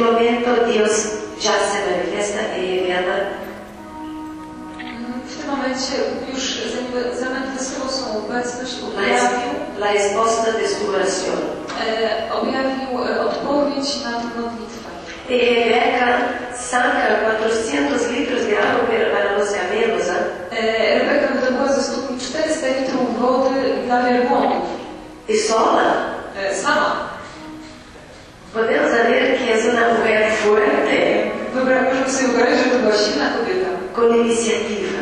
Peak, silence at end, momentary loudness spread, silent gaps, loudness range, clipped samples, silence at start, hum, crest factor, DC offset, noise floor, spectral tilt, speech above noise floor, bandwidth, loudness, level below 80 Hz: -2 dBFS; 0 s; 13 LU; none; 7 LU; under 0.1%; 0 s; none; 16 dB; under 0.1%; -40 dBFS; -3 dB/octave; 23 dB; 10.5 kHz; -19 LUFS; -50 dBFS